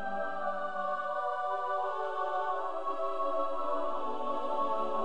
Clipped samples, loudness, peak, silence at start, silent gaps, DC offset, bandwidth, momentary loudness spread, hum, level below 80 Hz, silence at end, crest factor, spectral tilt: under 0.1%; -34 LUFS; -20 dBFS; 0 s; none; 1%; 9.6 kHz; 3 LU; none; -74 dBFS; 0 s; 12 dB; -5 dB/octave